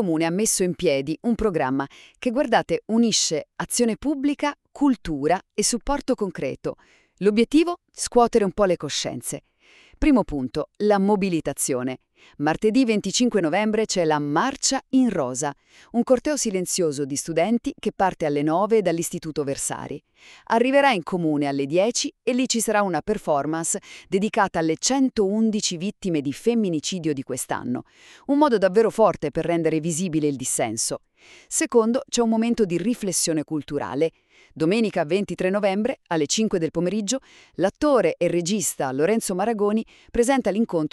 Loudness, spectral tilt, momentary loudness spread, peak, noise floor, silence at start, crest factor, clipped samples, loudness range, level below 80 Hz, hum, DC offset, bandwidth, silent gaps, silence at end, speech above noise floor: -23 LUFS; -4 dB/octave; 8 LU; -4 dBFS; -54 dBFS; 0 s; 18 dB; under 0.1%; 2 LU; -48 dBFS; none; under 0.1%; 13.5 kHz; none; 0.05 s; 31 dB